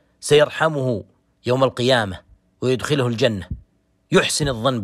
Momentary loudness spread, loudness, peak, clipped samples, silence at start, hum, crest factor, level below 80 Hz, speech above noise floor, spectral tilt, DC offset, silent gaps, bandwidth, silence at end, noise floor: 14 LU; -20 LUFS; -4 dBFS; under 0.1%; 0.2 s; none; 16 dB; -44 dBFS; 32 dB; -4.5 dB/octave; under 0.1%; none; 16 kHz; 0 s; -50 dBFS